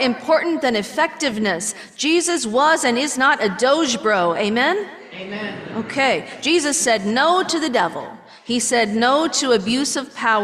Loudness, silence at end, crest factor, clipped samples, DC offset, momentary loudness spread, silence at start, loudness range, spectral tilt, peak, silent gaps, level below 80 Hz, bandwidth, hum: -18 LUFS; 0 s; 14 dB; under 0.1%; under 0.1%; 11 LU; 0 s; 2 LU; -2.5 dB/octave; -4 dBFS; none; -62 dBFS; 14.5 kHz; none